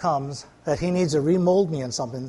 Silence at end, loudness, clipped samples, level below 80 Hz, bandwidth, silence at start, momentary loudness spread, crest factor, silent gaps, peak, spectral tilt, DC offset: 0 s; -23 LUFS; under 0.1%; -52 dBFS; 11.5 kHz; 0 s; 10 LU; 14 dB; none; -8 dBFS; -6 dB/octave; under 0.1%